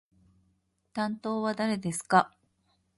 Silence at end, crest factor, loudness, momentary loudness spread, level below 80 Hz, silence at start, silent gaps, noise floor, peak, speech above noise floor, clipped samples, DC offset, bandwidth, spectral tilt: 0.7 s; 24 dB; -29 LUFS; 10 LU; -70 dBFS; 0.95 s; none; -73 dBFS; -8 dBFS; 45 dB; under 0.1%; under 0.1%; 11.5 kHz; -5 dB/octave